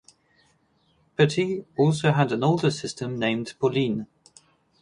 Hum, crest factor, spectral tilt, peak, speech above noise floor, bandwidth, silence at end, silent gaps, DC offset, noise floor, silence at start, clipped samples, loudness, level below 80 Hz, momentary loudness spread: none; 20 dB; -6 dB/octave; -4 dBFS; 42 dB; 11 kHz; 0.75 s; none; under 0.1%; -65 dBFS; 1.2 s; under 0.1%; -24 LUFS; -62 dBFS; 9 LU